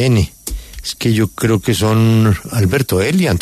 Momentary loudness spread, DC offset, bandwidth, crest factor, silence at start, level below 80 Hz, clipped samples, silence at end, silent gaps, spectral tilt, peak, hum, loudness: 13 LU; under 0.1%; 14 kHz; 12 dB; 0 s; -32 dBFS; under 0.1%; 0 s; none; -6 dB/octave; -2 dBFS; none; -15 LUFS